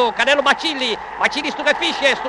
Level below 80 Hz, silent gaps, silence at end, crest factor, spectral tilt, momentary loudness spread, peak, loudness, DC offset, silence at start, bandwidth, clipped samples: -52 dBFS; none; 0 s; 18 dB; -1.5 dB/octave; 5 LU; -2 dBFS; -17 LUFS; under 0.1%; 0 s; 11.5 kHz; under 0.1%